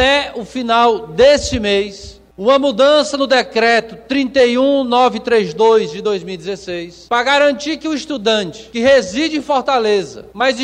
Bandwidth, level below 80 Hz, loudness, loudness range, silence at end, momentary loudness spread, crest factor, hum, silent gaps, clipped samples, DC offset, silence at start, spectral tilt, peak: 10 kHz; -42 dBFS; -14 LUFS; 3 LU; 0 s; 12 LU; 14 dB; none; none; under 0.1%; under 0.1%; 0 s; -3.5 dB/octave; 0 dBFS